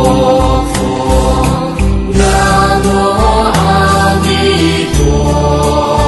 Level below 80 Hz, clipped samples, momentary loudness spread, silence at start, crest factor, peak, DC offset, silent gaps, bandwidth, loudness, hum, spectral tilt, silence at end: -16 dBFS; under 0.1%; 4 LU; 0 s; 10 dB; 0 dBFS; under 0.1%; none; 12.5 kHz; -10 LUFS; none; -5.5 dB/octave; 0 s